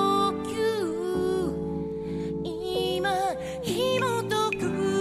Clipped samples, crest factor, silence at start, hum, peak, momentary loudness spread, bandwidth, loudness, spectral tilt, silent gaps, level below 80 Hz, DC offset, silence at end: under 0.1%; 14 dB; 0 s; none; -12 dBFS; 7 LU; 15 kHz; -28 LUFS; -5 dB/octave; none; -50 dBFS; under 0.1%; 0 s